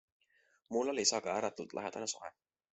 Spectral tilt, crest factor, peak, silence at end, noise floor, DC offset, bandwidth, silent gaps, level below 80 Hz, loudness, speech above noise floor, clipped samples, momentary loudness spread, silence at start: -1.5 dB/octave; 22 dB; -16 dBFS; 0.4 s; -73 dBFS; under 0.1%; 8.2 kHz; none; -80 dBFS; -36 LUFS; 37 dB; under 0.1%; 11 LU; 0.7 s